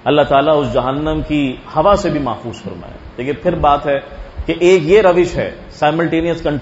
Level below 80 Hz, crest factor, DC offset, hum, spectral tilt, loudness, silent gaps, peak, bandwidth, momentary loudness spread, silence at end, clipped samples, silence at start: -34 dBFS; 14 dB; under 0.1%; none; -6.5 dB/octave; -15 LUFS; none; 0 dBFS; 8 kHz; 16 LU; 0 s; under 0.1%; 0.05 s